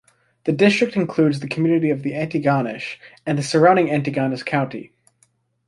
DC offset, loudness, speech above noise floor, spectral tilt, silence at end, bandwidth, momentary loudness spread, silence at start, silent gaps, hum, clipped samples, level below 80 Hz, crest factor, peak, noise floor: under 0.1%; -19 LUFS; 44 dB; -6.5 dB/octave; 0.8 s; 11.5 kHz; 13 LU; 0.45 s; none; none; under 0.1%; -60 dBFS; 18 dB; -2 dBFS; -63 dBFS